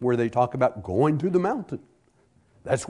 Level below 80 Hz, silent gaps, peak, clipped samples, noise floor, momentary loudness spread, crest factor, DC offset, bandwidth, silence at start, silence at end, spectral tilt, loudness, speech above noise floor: -60 dBFS; none; -8 dBFS; under 0.1%; -62 dBFS; 15 LU; 18 dB; under 0.1%; 11 kHz; 0 s; 0 s; -7 dB/octave; -24 LUFS; 39 dB